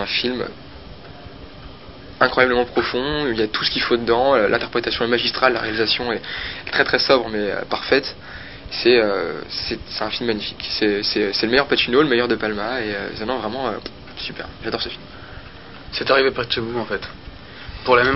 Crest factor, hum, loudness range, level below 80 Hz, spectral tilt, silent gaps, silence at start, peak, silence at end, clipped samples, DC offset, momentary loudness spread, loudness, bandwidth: 20 dB; none; 5 LU; -44 dBFS; -7.5 dB/octave; none; 0 s; 0 dBFS; 0 s; under 0.1%; 0.5%; 22 LU; -20 LUFS; 5.8 kHz